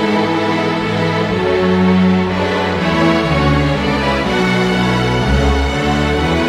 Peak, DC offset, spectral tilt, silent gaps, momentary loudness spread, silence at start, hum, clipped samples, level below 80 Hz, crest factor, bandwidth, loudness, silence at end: 0 dBFS; under 0.1%; -6.5 dB/octave; none; 3 LU; 0 s; none; under 0.1%; -26 dBFS; 14 dB; 12.5 kHz; -14 LUFS; 0 s